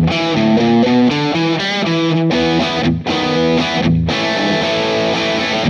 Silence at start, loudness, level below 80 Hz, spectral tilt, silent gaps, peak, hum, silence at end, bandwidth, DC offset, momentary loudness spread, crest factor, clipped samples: 0 s; -14 LUFS; -38 dBFS; -5.5 dB/octave; none; -4 dBFS; none; 0 s; 8.8 kHz; under 0.1%; 4 LU; 12 dB; under 0.1%